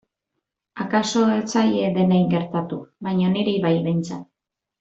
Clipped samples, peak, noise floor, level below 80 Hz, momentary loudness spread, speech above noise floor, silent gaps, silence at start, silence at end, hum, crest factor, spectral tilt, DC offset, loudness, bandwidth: under 0.1%; -6 dBFS; -83 dBFS; -62 dBFS; 12 LU; 63 dB; none; 0.75 s; 0.55 s; none; 16 dB; -6.5 dB/octave; under 0.1%; -21 LUFS; 8 kHz